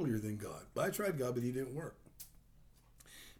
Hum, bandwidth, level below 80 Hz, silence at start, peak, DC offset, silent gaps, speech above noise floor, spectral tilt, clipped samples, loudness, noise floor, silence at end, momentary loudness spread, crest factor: none; over 20 kHz; -64 dBFS; 0 s; -24 dBFS; under 0.1%; none; 25 dB; -6 dB/octave; under 0.1%; -40 LUFS; -64 dBFS; 0.05 s; 18 LU; 16 dB